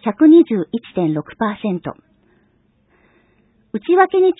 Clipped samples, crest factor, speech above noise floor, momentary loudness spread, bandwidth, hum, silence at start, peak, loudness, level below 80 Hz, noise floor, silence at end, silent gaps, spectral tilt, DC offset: under 0.1%; 16 dB; 44 dB; 16 LU; 4 kHz; none; 0.05 s; 0 dBFS; -16 LUFS; -60 dBFS; -59 dBFS; 0.05 s; none; -12 dB/octave; under 0.1%